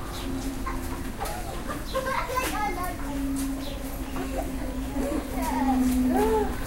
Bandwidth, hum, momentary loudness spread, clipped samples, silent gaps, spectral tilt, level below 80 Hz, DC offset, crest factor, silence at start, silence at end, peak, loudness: 16 kHz; none; 10 LU; under 0.1%; none; -5 dB/octave; -34 dBFS; under 0.1%; 16 dB; 0 s; 0 s; -12 dBFS; -29 LUFS